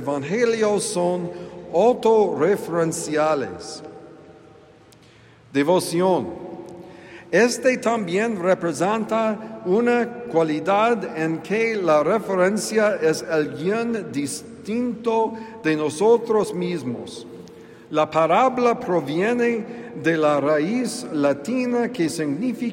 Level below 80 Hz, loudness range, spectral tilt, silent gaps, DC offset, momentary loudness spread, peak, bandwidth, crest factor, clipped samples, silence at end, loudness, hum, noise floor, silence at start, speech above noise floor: -66 dBFS; 4 LU; -5 dB/octave; none; under 0.1%; 13 LU; -6 dBFS; 16 kHz; 16 dB; under 0.1%; 0 s; -21 LUFS; none; -50 dBFS; 0 s; 29 dB